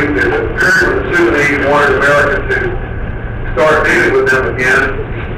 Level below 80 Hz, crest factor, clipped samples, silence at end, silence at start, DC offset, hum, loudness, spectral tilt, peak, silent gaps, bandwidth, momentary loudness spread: -24 dBFS; 10 dB; under 0.1%; 0 s; 0 s; under 0.1%; none; -11 LUFS; -5.5 dB/octave; -2 dBFS; none; 15.5 kHz; 12 LU